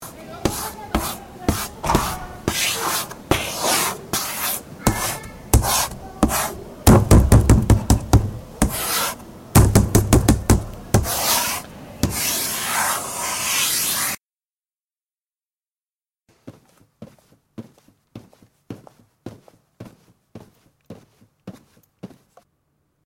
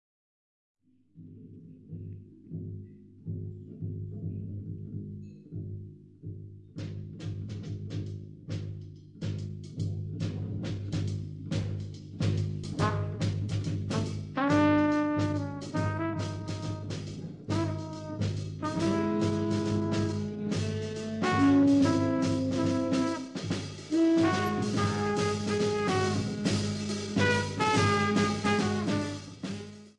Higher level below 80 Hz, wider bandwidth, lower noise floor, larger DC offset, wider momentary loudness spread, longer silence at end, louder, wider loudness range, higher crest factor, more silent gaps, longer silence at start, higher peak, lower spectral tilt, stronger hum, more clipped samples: first, -28 dBFS vs -58 dBFS; first, 17 kHz vs 12 kHz; first, under -90 dBFS vs -55 dBFS; neither; second, 15 LU vs 18 LU; first, 1 s vs 0.1 s; first, -19 LUFS vs -30 LUFS; second, 7 LU vs 14 LU; about the same, 20 dB vs 18 dB; first, 15.95-16.00 s vs none; second, 0 s vs 1.15 s; first, -2 dBFS vs -12 dBFS; second, -4 dB/octave vs -6 dB/octave; neither; neither